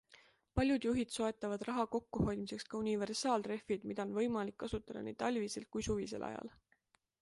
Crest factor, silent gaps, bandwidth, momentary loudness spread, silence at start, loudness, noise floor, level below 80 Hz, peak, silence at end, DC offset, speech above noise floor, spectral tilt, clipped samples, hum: 20 dB; none; 11.5 kHz; 8 LU; 0.1 s; -39 LUFS; -77 dBFS; -58 dBFS; -20 dBFS; 0.7 s; under 0.1%; 39 dB; -5 dB/octave; under 0.1%; none